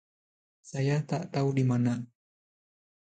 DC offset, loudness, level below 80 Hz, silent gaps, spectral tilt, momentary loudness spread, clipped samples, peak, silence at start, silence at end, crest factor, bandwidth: under 0.1%; -29 LUFS; -70 dBFS; none; -7.5 dB/octave; 11 LU; under 0.1%; -16 dBFS; 0.65 s; 1 s; 16 dB; 9 kHz